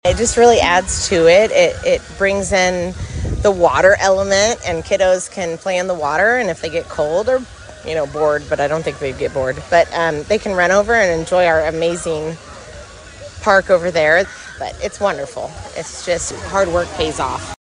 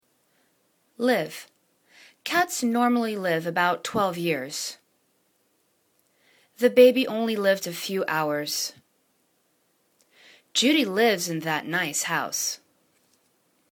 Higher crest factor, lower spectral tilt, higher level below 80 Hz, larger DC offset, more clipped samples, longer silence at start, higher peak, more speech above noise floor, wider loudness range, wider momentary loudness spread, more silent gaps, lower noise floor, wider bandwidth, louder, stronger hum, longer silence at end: second, 16 dB vs 22 dB; about the same, -3.5 dB/octave vs -3 dB/octave; first, -36 dBFS vs -74 dBFS; neither; neither; second, 0.05 s vs 1 s; first, 0 dBFS vs -4 dBFS; second, 20 dB vs 45 dB; about the same, 5 LU vs 5 LU; first, 14 LU vs 9 LU; neither; second, -36 dBFS vs -69 dBFS; second, 10.5 kHz vs 19 kHz; first, -16 LUFS vs -24 LUFS; neither; second, 0.1 s vs 1.15 s